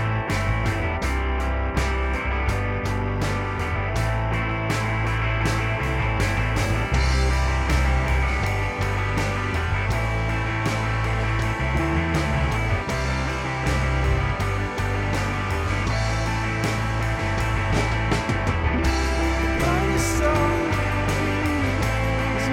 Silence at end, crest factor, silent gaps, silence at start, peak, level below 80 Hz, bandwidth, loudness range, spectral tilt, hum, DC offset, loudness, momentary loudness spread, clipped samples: 0 s; 14 dB; none; 0 s; -8 dBFS; -28 dBFS; 15.5 kHz; 2 LU; -5.5 dB/octave; none; under 0.1%; -23 LUFS; 3 LU; under 0.1%